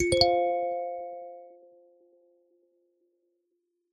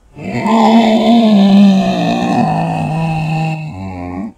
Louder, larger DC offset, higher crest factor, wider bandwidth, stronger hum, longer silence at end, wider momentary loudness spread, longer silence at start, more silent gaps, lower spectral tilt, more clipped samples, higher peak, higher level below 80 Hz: second, -27 LUFS vs -11 LUFS; neither; first, 26 dB vs 12 dB; about the same, 9.6 kHz vs 9.2 kHz; neither; first, 2.4 s vs 0.05 s; first, 23 LU vs 15 LU; second, 0 s vs 0.15 s; neither; second, -4 dB/octave vs -7 dB/octave; second, under 0.1% vs 0.1%; second, -6 dBFS vs 0 dBFS; second, -54 dBFS vs -44 dBFS